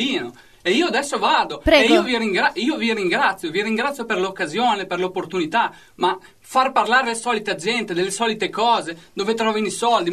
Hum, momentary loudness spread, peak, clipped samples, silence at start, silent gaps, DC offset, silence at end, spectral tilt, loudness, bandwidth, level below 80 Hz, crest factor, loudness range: none; 8 LU; -2 dBFS; under 0.1%; 0 s; none; 0.2%; 0 s; -3.5 dB/octave; -20 LUFS; 13.5 kHz; -44 dBFS; 18 dB; 4 LU